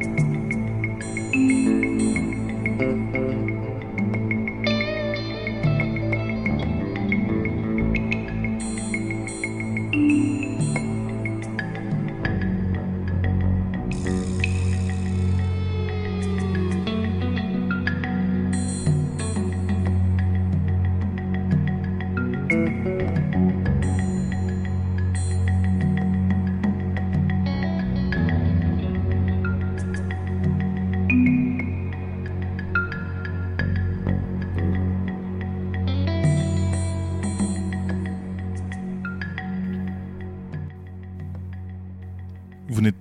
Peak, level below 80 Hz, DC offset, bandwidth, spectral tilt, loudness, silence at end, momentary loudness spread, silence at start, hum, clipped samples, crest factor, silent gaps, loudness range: -8 dBFS; -38 dBFS; under 0.1%; 10 kHz; -7 dB/octave; -24 LUFS; 0 s; 8 LU; 0 s; none; under 0.1%; 14 dB; none; 3 LU